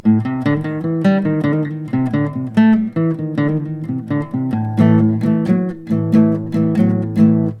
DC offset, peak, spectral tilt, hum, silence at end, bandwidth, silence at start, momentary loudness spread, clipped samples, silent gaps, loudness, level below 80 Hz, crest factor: under 0.1%; 0 dBFS; -9.5 dB/octave; none; 0 s; 5.8 kHz; 0.05 s; 7 LU; under 0.1%; none; -16 LUFS; -50 dBFS; 14 dB